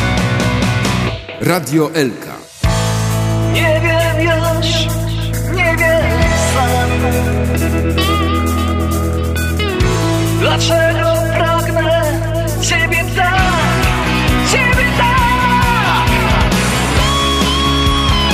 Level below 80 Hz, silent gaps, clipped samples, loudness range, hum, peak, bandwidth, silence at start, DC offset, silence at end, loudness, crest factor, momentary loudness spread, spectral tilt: -22 dBFS; none; under 0.1%; 3 LU; none; 0 dBFS; 15.5 kHz; 0 s; under 0.1%; 0 s; -14 LUFS; 12 dB; 5 LU; -4.5 dB/octave